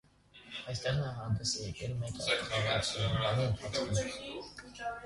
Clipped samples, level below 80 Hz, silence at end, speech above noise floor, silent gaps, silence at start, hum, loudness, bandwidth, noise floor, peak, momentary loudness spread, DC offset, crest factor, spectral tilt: under 0.1%; -54 dBFS; 0 s; 23 dB; none; 0.35 s; 50 Hz at -50 dBFS; -34 LUFS; 11.5 kHz; -58 dBFS; -18 dBFS; 12 LU; under 0.1%; 18 dB; -4 dB/octave